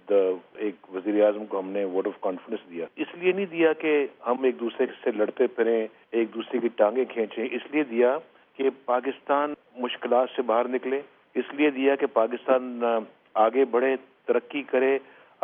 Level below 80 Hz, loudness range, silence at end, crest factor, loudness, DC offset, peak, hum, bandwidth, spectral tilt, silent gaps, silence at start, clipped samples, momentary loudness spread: -88 dBFS; 2 LU; 0.4 s; 18 dB; -26 LUFS; under 0.1%; -8 dBFS; none; 3.7 kHz; -3 dB/octave; none; 0.05 s; under 0.1%; 9 LU